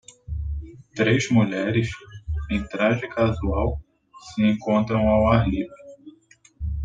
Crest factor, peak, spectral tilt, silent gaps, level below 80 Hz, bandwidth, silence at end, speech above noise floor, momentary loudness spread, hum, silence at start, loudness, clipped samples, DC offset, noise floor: 22 dB; -2 dBFS; -7 dB/octave; none; -36 dBFS; 9 kHz; 0 s; 34 dB; 16 LU; none; 0.3 s; -23 LUFS; under 0.1%; under 0.1%; -55 dBFS